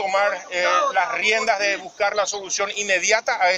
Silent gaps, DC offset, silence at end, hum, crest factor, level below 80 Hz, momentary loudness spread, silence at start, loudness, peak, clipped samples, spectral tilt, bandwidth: none; under 0.1%; 0 s; none; 16 dB; -64 dBFS; 5 LU; 0 s; -20 LUFS; -4 dBFS; under 0.1%; 0 dB/octave; 10.5 kHz